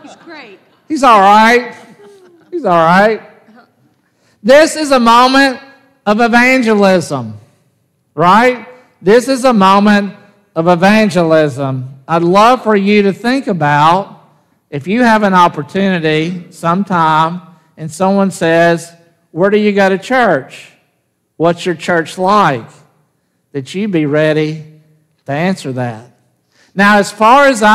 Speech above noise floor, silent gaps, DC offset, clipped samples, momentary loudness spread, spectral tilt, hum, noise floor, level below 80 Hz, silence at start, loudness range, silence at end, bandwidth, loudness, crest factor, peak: 53 dB; none; under 0.1%; under 0.1%; 15 LU; -5.5 dB/octave; none; -63 dBFS; -52 dBFS; 0.05 s; 5 LU; 0 s; 15 kHz; -10 LUFS; 12 dB; 0 dBFS